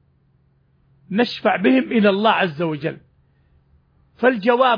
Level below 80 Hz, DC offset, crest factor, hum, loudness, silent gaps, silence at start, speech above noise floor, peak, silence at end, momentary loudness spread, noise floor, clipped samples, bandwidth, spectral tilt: -62 dBFS; under 0.1%; 18 dB; none; -18 LUFS; none; 1.1 s; 42 dB; -4 dBFS; 0 s; 11 LU; -60 dBFS; under 0.1%; 5.2 kHz; -7.5 dB/octave